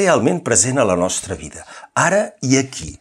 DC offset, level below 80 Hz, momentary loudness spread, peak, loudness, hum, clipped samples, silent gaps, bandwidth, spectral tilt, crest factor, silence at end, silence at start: under 0.1%; -48 dBFS; 14 LU; -2 dBFS; -17 LUFS; none; under 0.1%; none; 14 kHz; -4 dB/octave; 16 dB; 0.05 s; 0 s